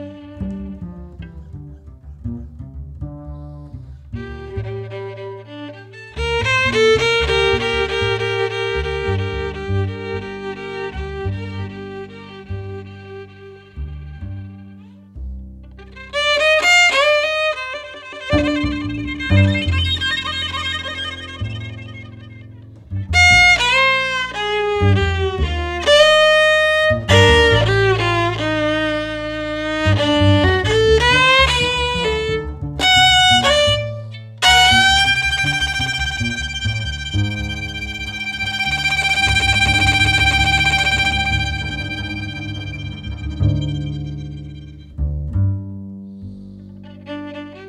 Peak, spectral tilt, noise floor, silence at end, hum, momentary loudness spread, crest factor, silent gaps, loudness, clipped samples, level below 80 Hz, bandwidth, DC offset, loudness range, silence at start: -2 dBFS; -4 dB/octave; -40 dBFS; 0 s; none; 23 LU; 16 dB; none; -15 LUFS; under 0.1%; -32 dBFS; 14 kHz; under 0.1%; 18 LU; 0 s